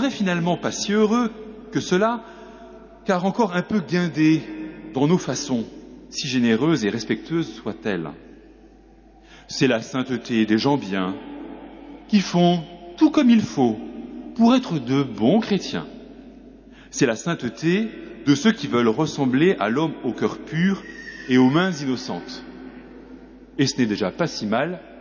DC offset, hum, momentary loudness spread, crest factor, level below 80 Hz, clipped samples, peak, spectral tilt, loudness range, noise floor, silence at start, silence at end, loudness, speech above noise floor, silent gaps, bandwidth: under 0.1%; none; 18 LU; 16 dB; -54 dBFS; under 0.1%; -6 dBFS; -5.5 dB/octave; 5 LU; -49 dBFS; 0 s; 0 s; -22 LUFS; 29 dB; none; 7.2 kHz